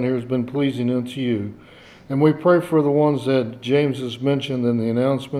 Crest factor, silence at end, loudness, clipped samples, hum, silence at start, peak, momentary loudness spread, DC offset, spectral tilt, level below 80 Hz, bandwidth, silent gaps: 16 dB; 0 s; -20 LUFS; under 0.1%; none; 0 s; -4 dBFS; 7 LU; under 0.1%; -8 dB/octave; -62 dBFS; 13 kHz; none